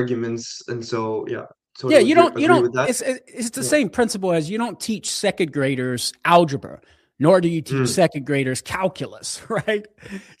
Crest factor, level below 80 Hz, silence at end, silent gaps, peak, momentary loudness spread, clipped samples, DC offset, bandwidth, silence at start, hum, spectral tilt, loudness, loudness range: 20 dB; -60 dBFS; 0.2 s; none; 0 dBFS; 14 LU; under 0.1%; under 0.1%; 15.5 kHz; 0 s; none; -4.5 dB/octave; -20 LUFS; 3 LU